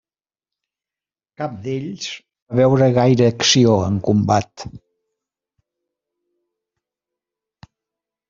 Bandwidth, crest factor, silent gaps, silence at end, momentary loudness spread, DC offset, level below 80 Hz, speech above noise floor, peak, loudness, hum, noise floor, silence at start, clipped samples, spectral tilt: 7.6 kHz; 18 dB; 2.42-2.46 s; 3.55 s; 17 LU; under 0.1%; -54 dBFS; over 73 dB; -2 dBFS; -16 LUFS; none; under -90 dBFS; 1.4 s; under 0.1%; -5.5 dB/octave